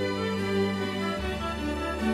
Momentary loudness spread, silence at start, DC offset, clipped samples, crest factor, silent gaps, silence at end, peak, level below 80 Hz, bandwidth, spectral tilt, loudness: 4 LU; 0 s; under 0.1%; under 0.1%; 14 dB; none; 0 s; -16 dBFS; -42 dBFS; 15 kHz; -6 dB/octave; -29 LUFS